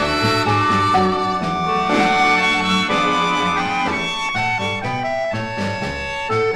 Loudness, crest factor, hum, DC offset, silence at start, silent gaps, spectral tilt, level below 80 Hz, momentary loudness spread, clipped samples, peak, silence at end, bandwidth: -18 LUFS; 14 dB; none; under 0.1%; 0 s; none; -4.5 dB/octave; -44 dBFS; 8 LU; under 0.1%; -4 dBFS; 0 s; 14 kHz